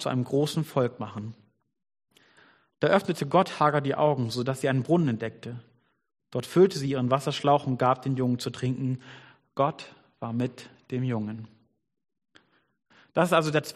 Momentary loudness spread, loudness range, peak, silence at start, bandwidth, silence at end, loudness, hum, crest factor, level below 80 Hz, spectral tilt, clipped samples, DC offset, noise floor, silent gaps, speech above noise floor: 16 LU; 8 LU; -6 dBFS; 0 s; 13.5 kHz; 0.05 s; -27 LUFS; none; 22 dB; -68 dBFS; -6.5 dB/octave; under 0.1%; under 0.1%; -63 dBFS; none; 37 dB